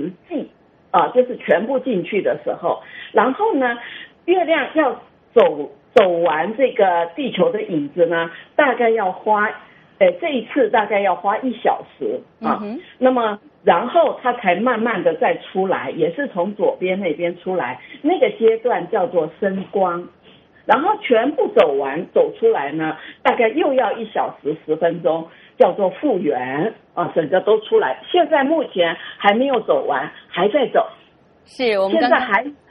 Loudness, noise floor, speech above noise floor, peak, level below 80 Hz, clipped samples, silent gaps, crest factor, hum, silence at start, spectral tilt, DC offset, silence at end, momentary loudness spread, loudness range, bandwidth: -18 LUFS; -52 dBFS; 34 dB; 0 dBFS; -66 dBFS; under 0.1%; none; 18 dB; none; 0 s; -3 dB/octave; under 0.1%; 0.15 s; 8 LU; 2 LU; 5.8 kHz